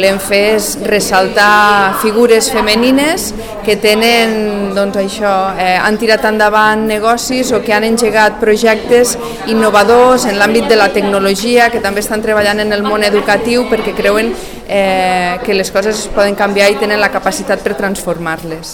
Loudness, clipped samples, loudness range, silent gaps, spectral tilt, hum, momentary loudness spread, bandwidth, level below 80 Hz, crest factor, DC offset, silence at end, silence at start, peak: -11 LUFS; under 0.1%; 3 LU; none; -3.5 dB/octave; none; 7 LU; 19 kHz; -36 dBFS; 10 dB; 0.3%; 0 s; 0 s; 0 dBFS